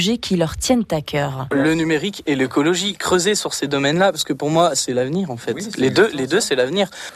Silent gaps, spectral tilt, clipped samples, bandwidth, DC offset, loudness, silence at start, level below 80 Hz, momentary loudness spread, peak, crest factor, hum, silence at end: none; -4 dB/octave; under 0.1%; 15 kHz; under 0.1%; -19 LUFS; 0 s; -46 dBFS; 6 LU; -4 dBFS; 16 dB; none; 0 s